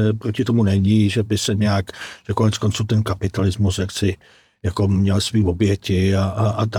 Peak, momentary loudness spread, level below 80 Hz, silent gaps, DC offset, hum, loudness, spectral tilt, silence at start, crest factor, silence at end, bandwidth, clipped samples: -4 dBFS; 7 LU; -46 dBFS; none; under 0.1%; none; -19 LUFS; -6 dB/octave; 0 s; 14 dB; 0 s; 15 kHz; under 0.1%